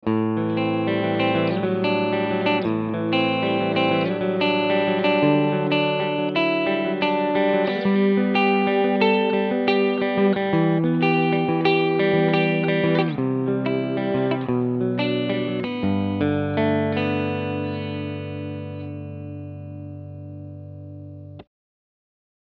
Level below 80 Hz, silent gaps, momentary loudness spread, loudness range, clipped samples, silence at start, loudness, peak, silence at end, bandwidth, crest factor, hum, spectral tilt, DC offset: -60 dBFS; none; 15 LU; 12 LU; under 0.1%; 0.05 s; -21 LUFS; -4 dBFS; 1.05 s; 6 kHz; 18 dB; 50 Hz at -60 dBFS; -9 dB/octave; under 0.1%